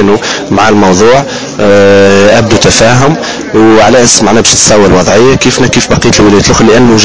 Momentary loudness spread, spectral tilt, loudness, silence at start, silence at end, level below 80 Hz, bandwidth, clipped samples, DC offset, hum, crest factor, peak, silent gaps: 6 LU; -4 dB/octave; -4 LUFS; 0 s; 0 s; -26 dBFS; 8 kHz; 10%; 7%; none; 4 dB; 0 dBFS; none